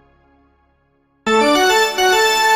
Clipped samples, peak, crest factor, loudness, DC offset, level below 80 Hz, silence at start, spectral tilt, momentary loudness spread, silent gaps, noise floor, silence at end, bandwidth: under 0.1%; -4 dBFS; 12 dB; -14 LUFS; under 0.1%; -50 dBFS; 1.25 s; -1.5 dB/octave; 5 LU; none; -60 dBFS; 0 s; 16 kHz